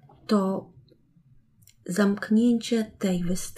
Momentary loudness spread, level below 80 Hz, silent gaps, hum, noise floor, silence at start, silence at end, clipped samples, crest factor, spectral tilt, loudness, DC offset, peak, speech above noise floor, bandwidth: 9 LU; -50 dBFS; none; none; -59 dBFS; 0.3 s; 0 s; under 0.1%; 16 dB; -6 dB/octave; -25 LUFS; under 0.1%; -10 dBFS; 35 dB; 14.5 kHz